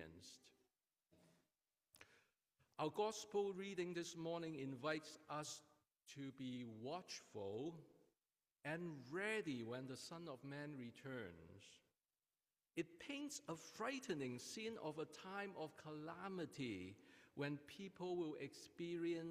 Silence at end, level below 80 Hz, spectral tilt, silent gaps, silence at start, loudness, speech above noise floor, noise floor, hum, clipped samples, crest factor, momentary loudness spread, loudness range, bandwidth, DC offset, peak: 0 s; -88 dBFS; -4.5 dB/octave; none; 0 s; -50 LUFS; over 41 dB; under -90 dBFS; none; under 0.1%; 20 dB; 15 LU; 6 LU; 15.5 kHz; under 0.1%; -30 dBFS